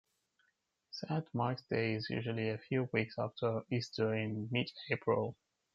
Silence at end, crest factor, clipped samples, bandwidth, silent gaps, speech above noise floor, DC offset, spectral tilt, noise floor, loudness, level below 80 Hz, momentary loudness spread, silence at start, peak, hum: 0.4 s; 22 dB; under 0.1%; 7.4 kHz; none; 44 dB; under 0.1%; -7 dB/octave; -80 dBFS; -37 LUFS; -76 dBFS; 5 LU; 0.95 s; -16 dBFS; none